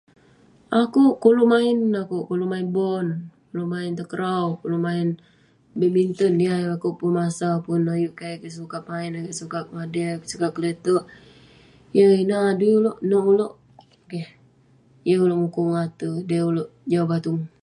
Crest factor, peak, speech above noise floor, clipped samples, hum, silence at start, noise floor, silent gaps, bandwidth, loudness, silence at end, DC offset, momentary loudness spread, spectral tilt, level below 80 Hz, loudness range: 18 dB; -4 dBFS; 35 dB; under 0.1%; none; 0.7 s; -56 dBFS; none; 11.5 kHz; -22 LUFS; 0.15 s; under 0.1%; 14 LU; -7 dB/octave; -66 dBFS; 6 LU